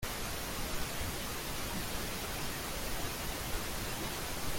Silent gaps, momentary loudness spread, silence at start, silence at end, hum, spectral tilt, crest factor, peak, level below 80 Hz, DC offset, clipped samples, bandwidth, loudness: none; 1 LU; 0 s; 0 s; none; -3 dB/octave; 14 dB; -22 dBFS; -44 dBFS; under 0.1%; under 0.1%; 17 kHz; -38 LUFS